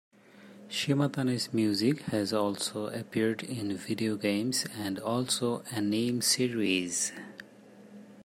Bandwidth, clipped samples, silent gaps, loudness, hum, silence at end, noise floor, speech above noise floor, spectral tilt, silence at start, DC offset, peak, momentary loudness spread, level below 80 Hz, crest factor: 16 kHz; under 0.1%; none; -30 LUFS; none; 0 s; -53 dBFS; 23 dB; -4 dB/octave; 0.35 s; under 0.1%; -12 dBFS; 8 LU; -72 dBFS; 18 dB